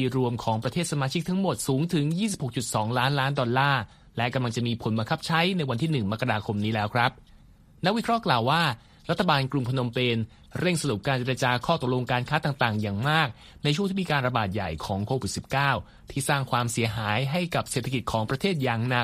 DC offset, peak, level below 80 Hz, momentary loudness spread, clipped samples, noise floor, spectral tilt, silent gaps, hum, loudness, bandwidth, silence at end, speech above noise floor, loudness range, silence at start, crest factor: under 0.1%; -6 dBFS; -52 dBFS; 5 LU; under 0.1%; -53 dBFS; -5 dB/octave; none; none; -26 LUFS; 15.5 kHz; 0 s; 27 dB; 1 LU; 0 s; 20 dB